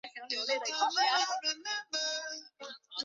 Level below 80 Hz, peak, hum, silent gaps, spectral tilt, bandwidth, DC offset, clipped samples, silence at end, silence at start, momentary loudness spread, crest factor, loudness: under -90 dBFS; -16 dBFS; none; none; 2 dB/octave; 7.8 kHz; under 0.1%; under 0.1%; 0 s; 0.05 s; 15 LU; 18 dB; -32 LUFS